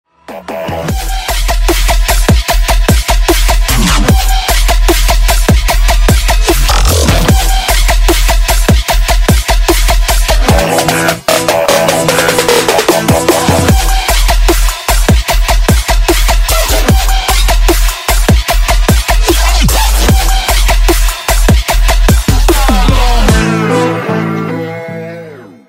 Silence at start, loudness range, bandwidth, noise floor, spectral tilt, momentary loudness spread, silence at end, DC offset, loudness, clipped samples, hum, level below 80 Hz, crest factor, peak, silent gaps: 0.3 s; 1 LU; 16.5 kHz; -29 dBFS; -4 dB/octave; 5 LU; 0.25 s; under 0.1%; -10 LUFS; under 0.1%; none; -10 dBFS; 8 dB; 0 dBFS; none